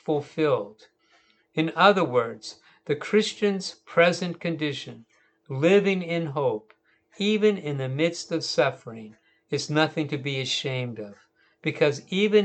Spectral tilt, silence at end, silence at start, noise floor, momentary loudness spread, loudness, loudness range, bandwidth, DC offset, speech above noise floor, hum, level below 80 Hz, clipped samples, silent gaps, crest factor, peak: -5 dB/octave; 0 s; 0.1 s; -63 dBFS; 16 LU; -25 LUFS; 4 LU; 8.8 kHz; under 0.1%; 38 dB; none; -76 dBFS; under 0.1%; none; 22 dB; -4 dBFS